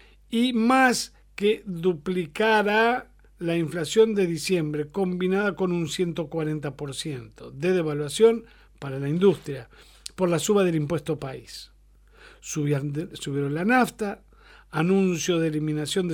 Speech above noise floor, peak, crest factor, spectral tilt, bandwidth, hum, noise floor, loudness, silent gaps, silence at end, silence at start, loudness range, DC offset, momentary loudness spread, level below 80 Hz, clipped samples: 30 dB; -8 dBFS; 18 dB; -5.5 dB/octave; 17.5 kHz; none; -55 dBFS; -25 LUFS; none; 0 s; 0.3 s; 4 LU; under 0.1%; 14 LU; -56 dBFS; under 0.1%